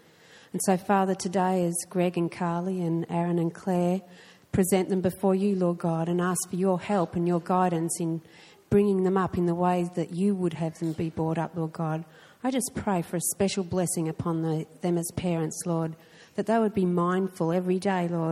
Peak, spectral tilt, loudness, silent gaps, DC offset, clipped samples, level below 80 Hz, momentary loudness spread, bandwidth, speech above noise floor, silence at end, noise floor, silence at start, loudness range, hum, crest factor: -8 dBFS; -6 dB/octave; -27 LUFS; none; under 0.1%; under 0.1%; -58 dBFS; 6 LU; 15 kHz; 28 dB; 0 s; -54 dBFS; 0.35 s; 3 LU; none; 18 dB